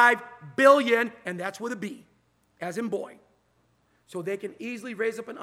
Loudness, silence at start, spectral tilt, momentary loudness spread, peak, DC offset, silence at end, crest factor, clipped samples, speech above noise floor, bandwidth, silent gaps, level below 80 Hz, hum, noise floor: -26 LUFS; 0 s; -4.5 dB/octave; 19 LU; -4 dBFS; under 0.1%; 0 s; 22 dB; under 0.1%; 42 dB; 15.5 kHz; none; -78 dBFS; none; -68 dBFS